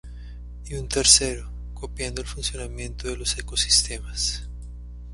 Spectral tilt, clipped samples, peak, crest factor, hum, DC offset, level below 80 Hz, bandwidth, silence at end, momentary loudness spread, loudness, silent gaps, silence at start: -1.5 dB/octave; under 0.1%; 0 dBFS; 26 dB; 60 Hz at -35 dBFS; under 0.1%; -34 dBFS; 11.5 kHz; 0 s; 25 LU; -22 LUFS; none; 0.05 s